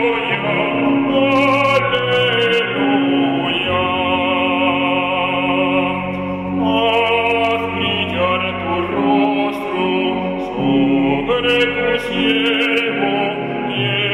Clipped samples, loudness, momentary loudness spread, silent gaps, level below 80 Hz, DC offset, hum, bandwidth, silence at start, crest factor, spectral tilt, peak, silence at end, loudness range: under 0.1%; -16 LUFS; 5 LU; none; -46 dBFS; under 0.1%; none; 11.5 kHz; 0 s; 14 dB; -6 dB/octave; -2 dBFS; 0 s; 2 LU